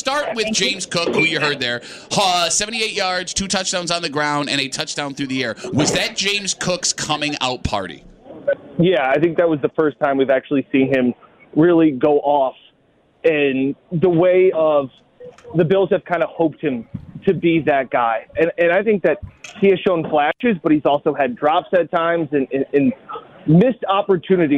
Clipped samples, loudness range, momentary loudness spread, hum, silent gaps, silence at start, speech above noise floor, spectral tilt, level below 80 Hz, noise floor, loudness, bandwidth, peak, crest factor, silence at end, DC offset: under 0.1%; 3 LU; 8 LU; none; none; 0.05 s; 40 dB; -4 dB/octave; -48 dBFS; -57 dBFS; -18 LUFS; 14.5 kHz; -4 dBFS; 14 dB; 0 s; under 0.1%